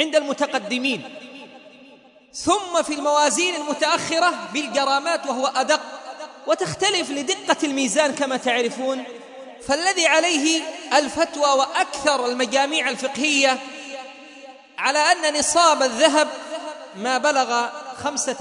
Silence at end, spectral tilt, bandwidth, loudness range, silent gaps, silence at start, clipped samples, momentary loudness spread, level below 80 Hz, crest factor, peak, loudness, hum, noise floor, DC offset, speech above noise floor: 0 s; -1.5 dB/octave; 11 kHz; 3 LU; none; 0 s; under 0.1%; 18 LU; -62 dBFS; 20 dB; -2 dBFS; -20 LUFS; none; -49 dBFS; under 0.1%; 29 dB